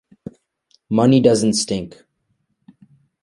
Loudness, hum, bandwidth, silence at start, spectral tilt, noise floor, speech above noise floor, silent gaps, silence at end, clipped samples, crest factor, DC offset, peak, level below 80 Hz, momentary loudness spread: -17 LUFS; none; 11.5 kHz; 0.9 s; -5.5 dB/octave; -69 dBFS; 54 dB; none; 1.35 s; under 0.1%; 18 dB; under 0.1%; -2 dBFS; -54 dBFS; 26 LU